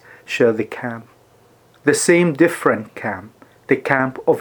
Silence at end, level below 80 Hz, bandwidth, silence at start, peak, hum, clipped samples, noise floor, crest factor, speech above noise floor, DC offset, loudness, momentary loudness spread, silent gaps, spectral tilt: 0 s; -64 dBFS; over 20 kHz; 0.3 s; 0 dBFS; none; under 0.1%; -52 dBFS; 20 dB; 35 dB; under 0.1%; -18 LUFS; 14 LU; none; -5 dB/octave